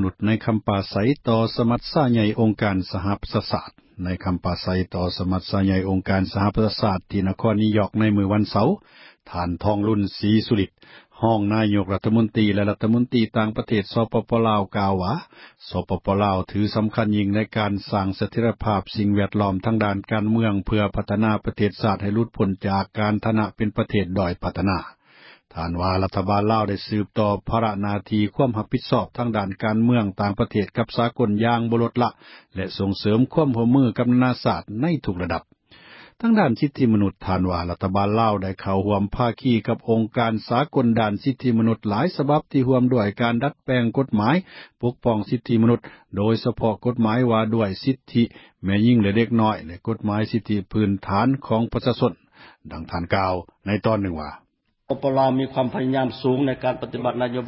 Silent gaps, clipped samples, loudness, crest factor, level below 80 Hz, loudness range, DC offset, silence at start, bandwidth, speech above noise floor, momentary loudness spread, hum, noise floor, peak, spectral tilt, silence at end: none; under 0.1%; -22 LUFS; 18 dB; -42 dBFS; 3 LU; under 0.1%; 0 s; 5.8 kHz; 29 dB; 7 LU; none; -51 dBFS; -4 dBFS; -12 dB/octave; 0 s